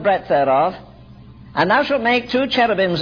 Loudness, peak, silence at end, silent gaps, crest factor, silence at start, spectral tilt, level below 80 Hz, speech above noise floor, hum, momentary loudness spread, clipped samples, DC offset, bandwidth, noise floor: -17 LUFS; -4 dBFS; 0 s; none; 14 dB; 0 s; -6.5 dB/octave; -50 dBFS; 24 dB; none; 6 LU; under 0.1%; 0.1%; 5.4 kHz; -41 dBFS